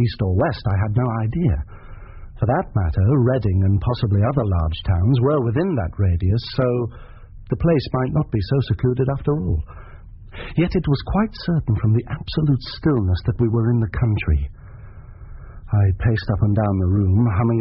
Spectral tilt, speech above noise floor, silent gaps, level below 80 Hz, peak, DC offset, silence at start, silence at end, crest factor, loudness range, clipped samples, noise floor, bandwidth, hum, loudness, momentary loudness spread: -8 dB/octave; 20 dB; none; -32 dBFS; -6 dBFS; under 0.1%; 0 s; 0 s; 14 dB; 3 LU; under 0.1%; -39 dBFS; 5.8 kHz; none; -20 LUFS; 6 LU